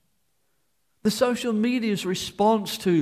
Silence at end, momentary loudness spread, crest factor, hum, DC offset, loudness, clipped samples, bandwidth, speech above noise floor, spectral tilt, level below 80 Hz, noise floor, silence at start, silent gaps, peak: 0 s; 5 LU; 16 dB; none; under 0.1%; -24 LUFS; under 0.1%; 15.5 kHz; 51 dB; -5 dB/octave; -60 dBFS; -74 dBFS; 1.05 s; none; -8 dBFS